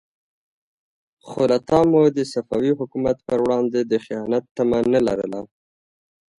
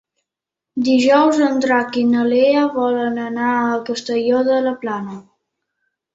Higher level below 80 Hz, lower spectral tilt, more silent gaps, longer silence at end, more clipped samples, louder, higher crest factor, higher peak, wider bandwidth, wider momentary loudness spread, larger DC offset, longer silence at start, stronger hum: first, -54 dBFS vs -64 dBFS; first, -7 dB/octave vs -5 dB/octave; first, 4.51-4.55 s vs none; about the same, 0.95 s vs 0.95 s; neither; second, -20 LUFS vs -17 LUFS; about the same, 18 dB vs 16 dB; about the same, -4 dBFS vs -2 dBFS; first, 11.5 kHz vs 7.8 kHz; second, 8 LU vs 11 LU; neither; first, 1.25 s vs 0.75 s; neither